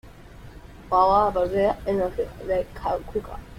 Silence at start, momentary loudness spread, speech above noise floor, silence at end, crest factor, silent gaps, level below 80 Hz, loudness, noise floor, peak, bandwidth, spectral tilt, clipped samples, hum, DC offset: 0.05 s; 11 LU; 20 dB; 0 s; 18 dB; none; -42 dBFS; -24 LUFS; -44 dBFS; -6 dBFS; 16 kHz; -7 dB/octave; under 0.1%; none; under 0.1%